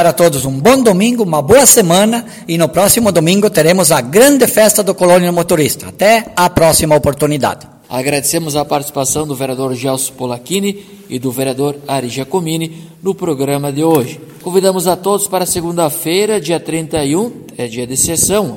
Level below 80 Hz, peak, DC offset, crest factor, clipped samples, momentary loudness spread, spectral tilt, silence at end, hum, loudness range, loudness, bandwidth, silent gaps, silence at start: -42 dBFS; 0 dBFS; under 0.1%; 12 dB; 0.3%; 11 LU; -4 dB/octave; 0 s; none; 8 LU; -12 LUFS; over 20 kHz; none; 0 s